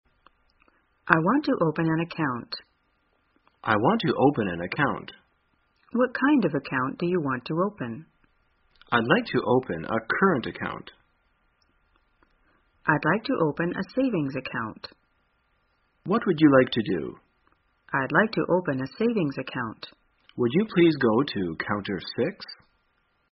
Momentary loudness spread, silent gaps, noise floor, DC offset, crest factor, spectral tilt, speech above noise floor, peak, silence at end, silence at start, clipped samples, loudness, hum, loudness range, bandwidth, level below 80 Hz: 15 LU; none; -70 dBFS; under 0.1%; 26 dB; -5 dB/octave; 45 dB; 0 dBFS; 0.8 s; 1.05 s; under 0.1%; -25 LUFS; none; 4 LU; 5.8 kHz; -62 dBFS